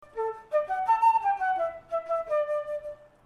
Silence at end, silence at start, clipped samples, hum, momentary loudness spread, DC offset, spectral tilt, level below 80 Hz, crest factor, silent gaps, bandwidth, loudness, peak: 0.3 s; 0 s; under 0.1%; none; 12 LU; under 0.1%; -3.5 dB/octave; -64 dBFS; 16 dB; none; 12 kHz; -28 LUFS; -12 dBFS